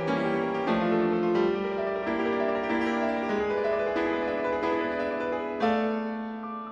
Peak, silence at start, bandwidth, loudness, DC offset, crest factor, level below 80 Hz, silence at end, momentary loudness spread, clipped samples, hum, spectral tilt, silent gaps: -12 dBFS; 0 s; 8 kHz; -28 LUFS; under 0.1%; 14 dB; -58 dBFS; 0 s; 5 LU; under 0.1%; none; -7 dB/octave; none